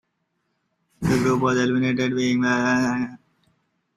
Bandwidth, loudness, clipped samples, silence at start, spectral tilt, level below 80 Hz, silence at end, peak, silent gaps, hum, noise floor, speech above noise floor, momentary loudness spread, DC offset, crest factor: 13 kHz; -22 LUFS; under 0.1%; 1 s; -5.5 dB/octave; -52 dBFS; 0.8 s; -8 dBFS; none; none; -74 dBFS; 53 dB; 7 LU; under 0.1%; 16 dB